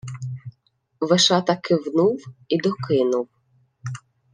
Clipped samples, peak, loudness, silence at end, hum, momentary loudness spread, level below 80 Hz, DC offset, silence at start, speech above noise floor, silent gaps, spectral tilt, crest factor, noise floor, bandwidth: under 0.1%; -4 dBFS; -21 LUFS; 0.35 s; none; 19 LU; -66 dBFS; under 0.1%; 0.05 s; 46 dB; none; -4.5 dB/octave; 20 dB; -66 dBFS; 10 kHz